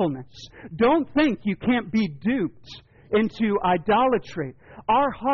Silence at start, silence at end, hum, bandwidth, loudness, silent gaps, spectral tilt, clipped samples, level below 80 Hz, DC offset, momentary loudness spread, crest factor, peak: 0 s; 0 s; none; 6.8 kHz; -23 LUFS; none; -4.5 dB/octave; under 0.1%; -50 dBFS; under 0.1%; 16 LU; 12 dB; -12 dBFS